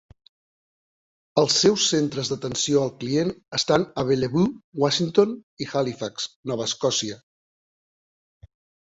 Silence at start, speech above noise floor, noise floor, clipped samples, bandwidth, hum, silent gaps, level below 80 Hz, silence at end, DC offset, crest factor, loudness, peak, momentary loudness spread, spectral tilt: 1.35 s; over 67 dB; under -90 dBFS; under 0.1%; 8 kHz; none; 4.64-4.73 s, 5.43-5.57 s, 6.36-6.43 s; -58 dBFS; 1.65 s; under 0.1%; 20 dB; -23 LUFS; -4 dBFS; 10 LU; -4 dB/octave